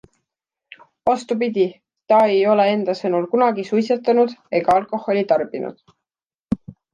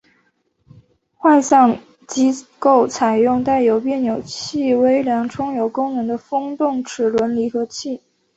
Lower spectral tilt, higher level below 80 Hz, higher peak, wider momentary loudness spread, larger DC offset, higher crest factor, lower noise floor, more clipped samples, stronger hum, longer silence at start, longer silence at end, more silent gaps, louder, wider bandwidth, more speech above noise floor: first, -6.5 dB/octave vs -4.5 dB/octave; about the same, -56 dBFS vs -58 dBFS; about the same, -4 dBFS vs -2 dBFS; about the same, 12 LU vs 11 LU; neither; about the same, 16 dB vs 16 dB; first, -90 dBFS vs -63 dBFS; neither; neither; second, 1.05 s vs 1.2 s; second, 0.2 s vs 0.4 s; first, 6.40-6.44 s vs none; about the same, -19 LUFS vs -18 LUFS; first, 10 kHz vs 8.2 kHz; first, 72 dB vs 47 dB